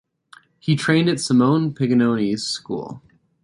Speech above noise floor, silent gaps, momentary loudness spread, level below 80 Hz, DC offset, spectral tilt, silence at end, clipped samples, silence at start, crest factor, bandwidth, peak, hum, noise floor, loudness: 32 dB; none; 13 LU; -62 dBFS; under 0.1%; -5.5 dB/octave; 0.45 s; under 0.1%; 0.65 s; 16 dB; 11.5 kHz; -4 dBFS; none; -51 dBFS; -20 LUFS